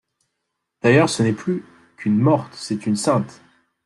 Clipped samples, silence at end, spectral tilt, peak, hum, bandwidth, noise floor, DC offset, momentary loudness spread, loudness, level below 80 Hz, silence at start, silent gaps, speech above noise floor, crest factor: under 0.1%; 0.55 s; -6 dB/octave; -2 dBFS; none; 12 kHz; -78 dBFS; under 0.1%; 12 LU; -20 LUFS; -60 dBFS; 0.85 s; none; 59 dB; 18 dB